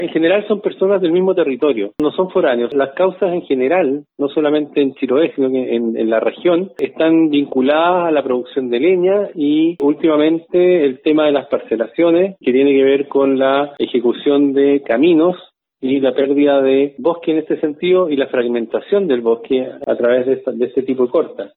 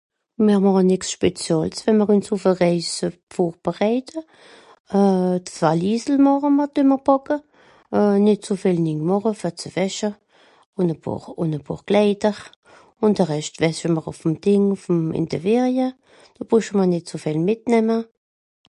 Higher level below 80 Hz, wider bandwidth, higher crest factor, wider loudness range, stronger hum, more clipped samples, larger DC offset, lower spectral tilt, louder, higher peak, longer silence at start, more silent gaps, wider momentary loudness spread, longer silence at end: about the same, -62 dBFS vs -58 dBFS; second, 4.2 kHz vs 11 kHz; about the same, 12 dB vs 16 dB; about the same, 2 LU vs 4 LU; neither; neither; neither; first, -9 dB/octave vs -6.5 dB/octave; first, -15 LUFS vs -20 LUFS; about the same, -2 dBFS vs -4 dBFS; second, 0 s vs 0.4 s; second, none vs 3.23-3.27 s, 4.80-4.85 s, 10.66-10.73 s, 12.56-12.63 s; second, 6 LU vs 10 LU; second, 0.1 s vs 0.7 s